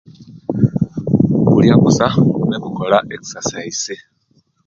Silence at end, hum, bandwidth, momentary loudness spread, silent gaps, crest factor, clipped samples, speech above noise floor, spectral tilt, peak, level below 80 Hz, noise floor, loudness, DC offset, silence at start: 0.7 s; none; 7.6 kHz; 14 LU; none; 16 dB; under 0.1%; 44 dB; -6 dB/octave; 0 dBFS; -44 dBFS; -59 dBFS; -15 LUFS; under 0.1%; 0.2 s